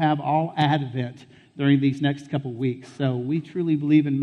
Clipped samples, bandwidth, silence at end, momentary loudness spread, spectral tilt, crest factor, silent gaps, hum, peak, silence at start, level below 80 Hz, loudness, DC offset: under 0.1%; 8.2 kHz; 0 s; 9 LU; -8 dB/octave; 16 dB; none; none; -6 dBFS; 0 s; -66 dBFS; -24 LUFS; under 0.1%